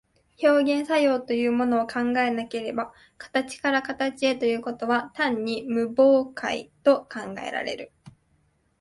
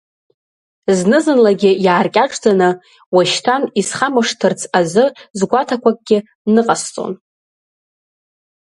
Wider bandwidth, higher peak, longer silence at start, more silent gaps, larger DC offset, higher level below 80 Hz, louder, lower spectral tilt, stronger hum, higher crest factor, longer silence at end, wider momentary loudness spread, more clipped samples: about the same, 11.5 kHz vs 11.5 kHz; second, -8 dBFS vs 0 dBFS; second, 0.4 s vs 0.9 s; second, none vs 3.06-3.12 s, 5.30-5.34 s, 6.35-6.45 s; neither; about the same, -66 dBFS vs -62 dBFS; second, -24 LUFS vs -15 LUFS; about the same, -4.5 dB/octave vs -4.5 dB/octave; neither; about the same, 18 dB vs 16 dB; second, 0.7 s vs 1.5 s; first, 11 LU vs 8 LU; neither